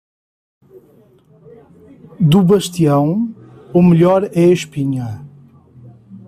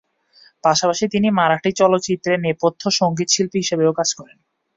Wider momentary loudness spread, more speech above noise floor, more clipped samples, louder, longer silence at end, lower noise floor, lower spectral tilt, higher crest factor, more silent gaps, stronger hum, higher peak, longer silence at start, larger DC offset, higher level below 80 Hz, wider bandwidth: first, 13 LU vs 4 LU; about the same, 37 dB vs 35 dB; neither; first, -14 LUFS vs -18 LUFS; second, 0.1 s vs 0.5 s; second, -49 dBFS vs -53 dBFS; first, -7.5 dB/octave vs -4 dB/octave; about the same, 14 dB vs 16 dB; neither; neither; about the same, -2 dBFS vs -2 dBFS; first, 2.2 s vs 0.65 s; neither; first, -50 dBFS vs -58 dBFS; first, 14.5 kHz vs 7.8 kHz